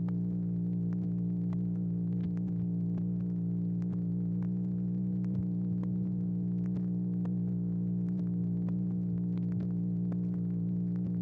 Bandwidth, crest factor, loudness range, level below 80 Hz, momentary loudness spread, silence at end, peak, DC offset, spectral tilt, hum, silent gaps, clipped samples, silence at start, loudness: 2 kHz; 8 dB; 0 LU; -56 dBFS; 1 LU; 0 s; -24 dBFS; under 0.1%; -13 dB/octave; 60 Hz at -45 dBFS; none; under 0.1%; 0 s; -33 LUFS